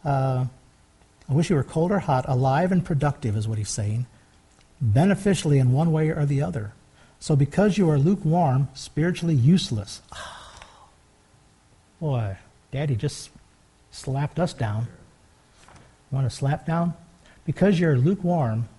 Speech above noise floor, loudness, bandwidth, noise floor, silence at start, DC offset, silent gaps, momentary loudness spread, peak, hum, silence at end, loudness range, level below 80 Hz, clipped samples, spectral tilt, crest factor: 35 dB; -23 LUFS; 11.5 kHz; -58 dBFS; 0.05 s; under 0.1%; none; 17 LU; -8 dBFS; none; 0.1 s; 10 LU; -50 dBFS; under 0.1%; -7 dB/octave; 16 dB